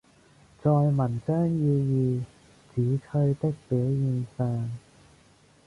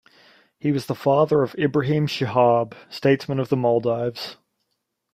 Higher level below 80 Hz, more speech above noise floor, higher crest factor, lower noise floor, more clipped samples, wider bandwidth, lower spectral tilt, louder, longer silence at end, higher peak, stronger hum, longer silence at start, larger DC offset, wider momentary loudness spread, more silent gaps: about the same, -58 dBFS vs -62 dBFS; second, 33 dB vs 56 dB; about the same, 14 dB vs 18 dB; second, -58 dBFS vs -77 dBFS; neither; second, 10.5 kHz vs 15 kHz; first, -10.5 dB/octave vs -7.5 dB/octave; second, -27 LUFS vs -21 LUFS; about the same, 0.9 s vs 0.8 s; second, -12 dBFS vs -4 dBFS; neither; about the same, 0.65 s vs 0.65 s; neither; about the same, 9 LU vs 10 LU; neither